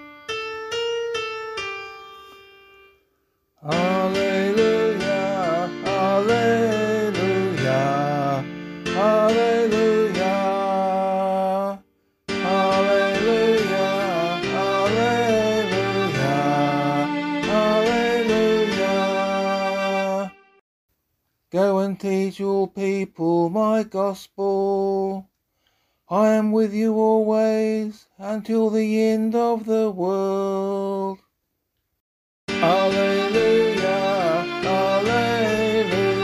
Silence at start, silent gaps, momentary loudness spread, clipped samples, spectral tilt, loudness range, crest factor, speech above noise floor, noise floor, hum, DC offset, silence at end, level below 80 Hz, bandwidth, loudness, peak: 0 s; 20.61-20.89 s, 32.00-32.48 s; 9 LU; under 0.1%; -5.5 dB/octave; 4 LU; 16 dB; 54 dB; -75 dBFS; none; under 0.1%; 0 s; -56 dBFS; 13.5 kHz; -21 LUFS; -6 dBFS